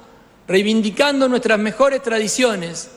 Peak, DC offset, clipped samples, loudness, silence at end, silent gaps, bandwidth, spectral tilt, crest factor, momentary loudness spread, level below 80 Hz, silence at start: -4 dBFS; under 0.1%; under 0.1%; -17 LUFS; 0.1 s; none; 13.5 kHz; -3.5 dB/octave; 14 dB; 4 LU; -56 dBFS; 0.5 s